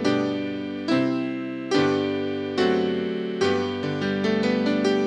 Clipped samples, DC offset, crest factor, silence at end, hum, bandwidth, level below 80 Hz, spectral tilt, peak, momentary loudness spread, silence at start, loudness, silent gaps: under 0.1%; under 0.1%; 14 dB; 0 s; none; 9.8 kHz; -70 dBFS; -6 dB/octave; -8 dBFS; 6 LU; 0 s; -24 LUFS; none